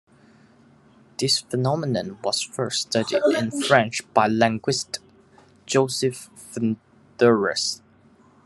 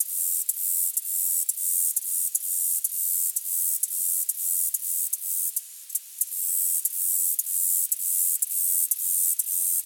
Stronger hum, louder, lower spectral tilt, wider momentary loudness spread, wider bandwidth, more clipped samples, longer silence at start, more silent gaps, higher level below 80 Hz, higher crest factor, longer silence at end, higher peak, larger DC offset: neither; about the same, -22 LUFS vs -23 LUFS; first, -4 dB/octave vs 9.5 dB/octave; first, 11 LU vs 4 LU; second, 12.5 kHz vs 19.5 kHz; neither; first, 1.2 s vs 0 s; neither; first, -66 dBFS vs under -90 dBFS; about the same, 24 dB vs 20 dB; first, 0.7 s vs 0 s; first, 0 dBFS vs -6 dBFS; neither